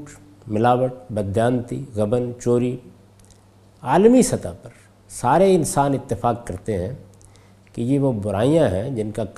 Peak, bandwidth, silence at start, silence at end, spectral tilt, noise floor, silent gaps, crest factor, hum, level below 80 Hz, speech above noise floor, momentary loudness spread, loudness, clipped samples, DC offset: -2 dBFS; 14.5 kHz; 0 s; 0.05 s; -6.5 dB/octave; -51 dBFS; none; 18 dB; none; -46 dBFS; 31 dB; 15 LU; -20 LUFS; under 0.1%; under 0.1%